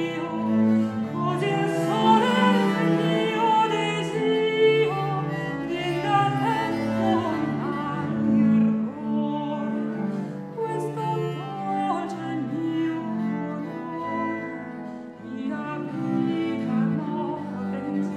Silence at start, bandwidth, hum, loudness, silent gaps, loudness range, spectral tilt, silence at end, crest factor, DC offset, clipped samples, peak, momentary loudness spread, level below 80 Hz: 0 s; 12 kHz; none; -25 LUFS; none; 8 LU; -7 dB/octave; 0 s; 18 dB; under 0.1%; under 0.1%; -6 dBFS; 11 LU; -62 dBFS